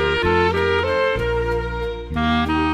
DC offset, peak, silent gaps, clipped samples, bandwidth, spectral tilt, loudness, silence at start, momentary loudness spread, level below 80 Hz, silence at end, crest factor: under 0.1%; -6 dBFS; none; under 0.1%; 12 kHz; -6.5 dB/octave; -20 LUFS; 0 s; 8 LU; -32 dBFS; 0 s; 14 dB